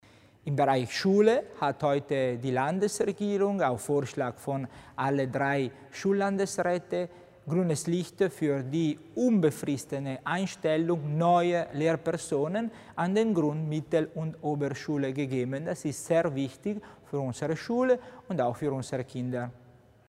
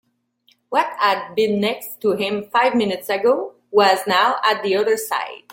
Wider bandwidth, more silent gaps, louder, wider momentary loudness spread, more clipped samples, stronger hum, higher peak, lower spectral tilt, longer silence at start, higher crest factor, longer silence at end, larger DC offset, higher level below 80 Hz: about the same, 16 kHz vs 17 kHz; neither; second, -29 LUFS vs -19 LUFS; about the same, 9 LU vs 7 LU; neither; neither; second, -10 dBFS vs -2 dBFS; first, -6 dB/octave vs -4 dB/octave; second, 0.45 s vs 0.7 s; about the same, 20 dB vs 18 dB; first, 0.55 s vs 0.15 s; neither; about the same, -66 dBFS vs -66 dBFS